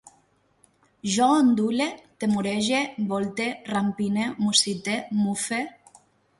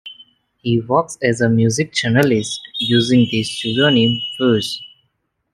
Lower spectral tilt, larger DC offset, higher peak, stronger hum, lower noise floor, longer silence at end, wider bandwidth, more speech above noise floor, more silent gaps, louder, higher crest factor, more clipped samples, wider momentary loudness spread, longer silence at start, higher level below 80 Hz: second, -3.5 dB/octave vs -5 dB/octave; neither; second, -6 dBFS vs -2 dBFS; neither; second, -64 dBFS vs -69 dBFS; about the same, 0.7 s vs 0.65 s; second, 11.5 kHz vs 13 kHz; second, 40 dB vs 53 dB; neither; second, -24 LUFS vs -16 LUFS; about the same, 20 dB vs 16 dB; neither; about the same, 9 LU vs 10 LU; first, 1.05 s vs 0.05 s; second, -66 dBFS vs -56 dBFS